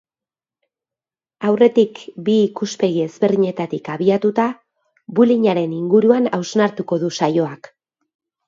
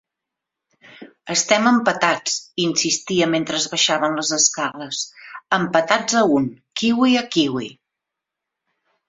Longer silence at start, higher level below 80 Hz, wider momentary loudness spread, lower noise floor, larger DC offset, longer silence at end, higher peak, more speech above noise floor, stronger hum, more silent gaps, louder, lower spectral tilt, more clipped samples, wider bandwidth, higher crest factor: first, 1.4 s vs 1 s; about the same, -68 dBFS vs -64 dBFS; about the same, 10 LU vs 10 LU; first, under -90 dBFS vs -84 dBFS; neither; second, 0.95 s vs 1.35 s; about the same, 0 dBFS vs 0 dBFS; first, over 73 dB vs 65 dB; neither; neither; about the same, -18 LUFS vs -19 LUFS; first, -6.5 dB/octave vs -2.5 dB/octave; neither; about the same, 7.6 kHz vs 8 kHz; about the same, 18 dB vs 20 dB